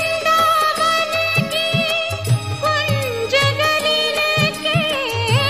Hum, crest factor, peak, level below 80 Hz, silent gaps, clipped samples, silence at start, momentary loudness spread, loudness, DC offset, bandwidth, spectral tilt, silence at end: none; 14 dB; -4 dBFS; -48 dBFS; none; under 0.1%; 0 s; 5 LU; -17 LUFS; 0.3%; 15.5 kHz; -4 dB/octave; 0 s